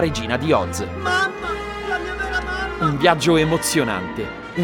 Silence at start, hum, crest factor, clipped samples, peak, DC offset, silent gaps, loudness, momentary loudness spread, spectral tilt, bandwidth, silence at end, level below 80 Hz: 0 s; none; 20 dB; under 0.1%; -2 dBFS; under 0.1%; none; -20 LUFS; 10 LU; -4.5 dB/octave; over 20 kHz; 0 s; -38 dBFS